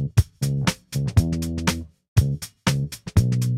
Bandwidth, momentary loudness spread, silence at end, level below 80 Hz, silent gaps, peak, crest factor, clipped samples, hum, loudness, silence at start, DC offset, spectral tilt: 16 kHz; 5 LU; 0 s; -34 dBFS; 2.08-2.16 s; -4 dBFS; 18 dB; under 0.1%; none; -24 LUFS; 0 s; under 0.1%; -5.5 dB/octave